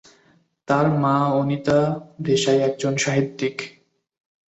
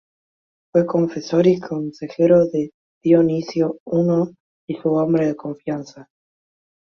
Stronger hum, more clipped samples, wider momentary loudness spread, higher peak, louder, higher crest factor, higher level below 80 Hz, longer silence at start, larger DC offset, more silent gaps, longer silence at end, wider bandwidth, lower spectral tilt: neither; neither; second, 8 LU vs 13 LU; about the same, -4 dBFS vs -2 dBFS; about the same, -21 LUFS vs -20 LUFS; about the same, 18 dB vs 18 dB; about the same, -58 dBFS vs -62 dBFS; about the same, 0.7 s vs 0.75 s; neither; second, none vs 2.74-3.01 s, 3.80-3.86 s, 4.40-4.68 s; about the same, 0.8 s vs 0.9 s; first, 8.2 kHz vs 6.8 kHz; second, -5.5 dB/octave vs -8 dB/octave